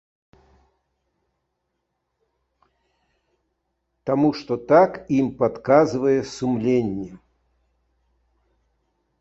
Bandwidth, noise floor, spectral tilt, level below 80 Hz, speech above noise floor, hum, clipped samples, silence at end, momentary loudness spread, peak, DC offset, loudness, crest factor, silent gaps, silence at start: 8 kHz; -76 dBFS; -7 dB/octave; -58 dBFS; 57 dB; none; under 0.1%; 2.05 s; 12 LU; -2 dBFS; under 0.1%; -20 LUFS; 22 dB; none; 4.05 s